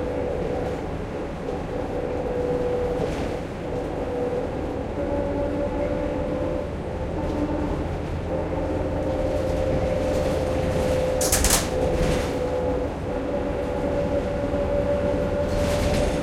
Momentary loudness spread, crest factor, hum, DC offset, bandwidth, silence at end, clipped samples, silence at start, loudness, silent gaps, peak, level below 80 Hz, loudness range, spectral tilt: 6 LU; 20 dB; none; under 0.1%; 16.5 kHz; 0 s; under 0.1%; 0 s; -25 LUFS; none; -4 dBFS; -34 dBFS; 4 LU; -5 dB/octave